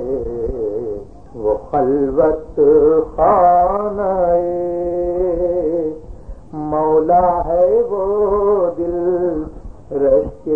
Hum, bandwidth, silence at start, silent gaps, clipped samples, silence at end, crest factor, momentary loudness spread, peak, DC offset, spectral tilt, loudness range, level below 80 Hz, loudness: none; 2.7 kHz; 0 s; none; under 0.1%; 0 s; 14 dB; 13 LU; -2 dBFS; 0.9%; -10.5 dB/octave; 3 LU; -36 dBFS; -16 LUFS